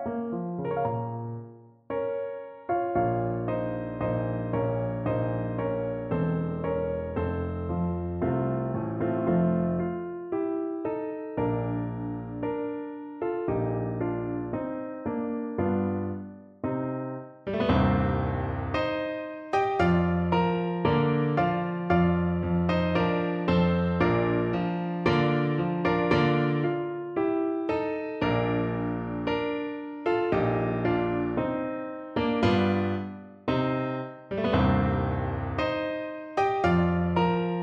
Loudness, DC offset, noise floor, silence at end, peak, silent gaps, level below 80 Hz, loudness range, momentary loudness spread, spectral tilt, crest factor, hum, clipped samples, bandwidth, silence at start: -28 LUFS; under 0.1%; -47 dBFS; 0 s; -10 dBFS; none; -46 dBFS; 6 LU; 9 LU; -9 dB/octave; 18 dB; none; under 0.1%; 6.8 kHz; 0 s